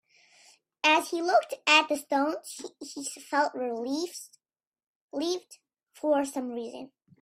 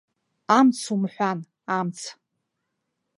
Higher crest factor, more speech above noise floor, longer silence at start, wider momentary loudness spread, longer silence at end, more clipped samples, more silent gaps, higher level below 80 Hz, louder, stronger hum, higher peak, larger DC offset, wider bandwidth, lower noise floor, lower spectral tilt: about the same, 24 dB vs 22 dB; first, over 61 dB vs 57 dB; first, 0.85 s vs 0.5 s; first, 19 LU vs 16 LU; second, 0.35 s vs 1.05 s; neither; first, 4.67-4.72 s, 4.87-5.09 s vs none; about the same, -80 dBFS vs -78 dBFS; second, -28 LUFS vs -23 LUFS; neither; about the same, -6 dBFS vs -4 dBFS; neither; first, 16 kHz vs 11.5 kHz; first, under -90 dBFS vs -79 dBFS; second, -1 dB/octave vs -5 dB/octave